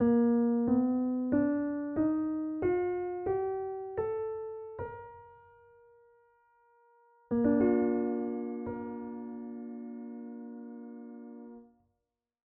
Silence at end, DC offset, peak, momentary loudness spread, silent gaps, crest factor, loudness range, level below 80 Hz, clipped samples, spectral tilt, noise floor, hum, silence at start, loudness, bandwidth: 0.85 s; under 0.1%; -16 dBFS; 19 LU; none; 16 dB; 13 LU; -64 dBFS; under 0.1%; -9.5 dB/octave; -85 dBFS; none; 0 s; -32 LUFS; 2.9 kHz